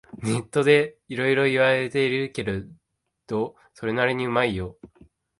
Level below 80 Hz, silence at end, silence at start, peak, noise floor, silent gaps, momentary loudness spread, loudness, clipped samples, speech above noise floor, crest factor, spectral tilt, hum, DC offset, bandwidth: -52 dBFS; 0.55 s; 0.15 s; -6 dBFS; -69 dBFS; none; 13 LU; -23 LUFS; under 0.1%; 45 dB; 20 dB; -5.5 dB/octave; none; under 0.1%; 11.5 kHz